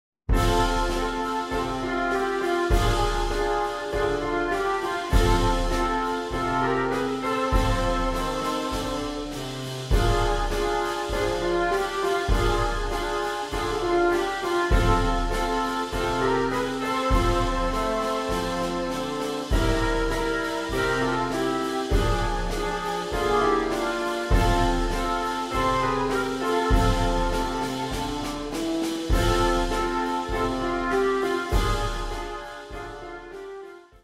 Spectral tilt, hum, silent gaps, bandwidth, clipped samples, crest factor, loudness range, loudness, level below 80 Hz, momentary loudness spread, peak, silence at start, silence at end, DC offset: -5 dB/octave; none; none; 15.5 kHz; under 0.1%; 18 dB; 2 LU; -25 LUFS; -30 dBFS; 6 LU; -6 dBFS; 0.3 s; 0.25 s; under 0.1%